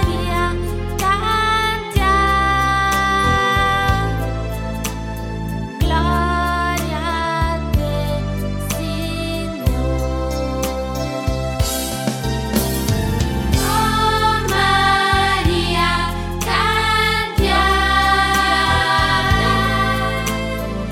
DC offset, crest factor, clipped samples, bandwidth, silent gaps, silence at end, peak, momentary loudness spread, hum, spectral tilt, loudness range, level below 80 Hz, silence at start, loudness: under 0.1%; 14 dB; under 0.1%; 17.5 kHz; none; 0 s; -2 dBFS; 9 LU; none; -4.5 dB/octave; 6 LU; -26 dBFS; 0 s; -18 LUFS